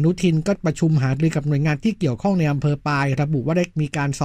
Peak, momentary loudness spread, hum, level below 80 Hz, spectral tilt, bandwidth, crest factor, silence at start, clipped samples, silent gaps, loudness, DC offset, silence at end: -6 dBFS; 3 LU; none; -46 dBFS; -7 dB/octave; 10 kHz; 14 dB; 0 s; under 0.1%; none; -21 LUFS; under 0.1%; 0 s